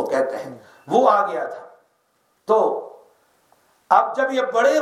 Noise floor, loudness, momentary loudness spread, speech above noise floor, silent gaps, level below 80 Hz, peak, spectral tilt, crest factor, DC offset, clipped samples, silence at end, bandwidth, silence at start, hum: -66 dBFS; -20 LUFS; 20 LU; 46 dB; none; -76 dBFS; 0 dBFS; -4 dB/octave; 20 dB; under 0.1%; under 0.1%; 0 s; 13.5 kHz; 0 s; none